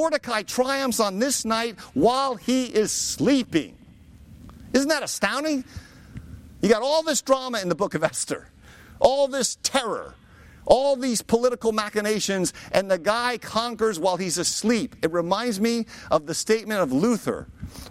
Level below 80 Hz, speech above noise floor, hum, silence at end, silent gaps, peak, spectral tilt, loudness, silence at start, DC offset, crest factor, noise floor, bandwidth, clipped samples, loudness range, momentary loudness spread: -52 dBFS; 25 dB; none; 0 s; none; -2 dBFS; -3.5 dB/octave; -23 LUFS; 0 s; under 0.1%; 22 dB; -48 dBFS; 16.5 kHz; under 0.1%; 2 LU; 9 LU